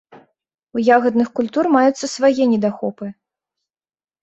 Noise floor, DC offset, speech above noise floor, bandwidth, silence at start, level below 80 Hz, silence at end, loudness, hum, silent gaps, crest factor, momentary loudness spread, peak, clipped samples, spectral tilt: under -90 dBFS; under 0.1%; over 74 dB; 8.2 kHz; 0.15 s; -64 dBFS; 1.1 s; -17 LUFS; none; 0.63-0.67 s; 18 dB; 12 LU; -2 dBFS; under 0.1%; -5 dB/octave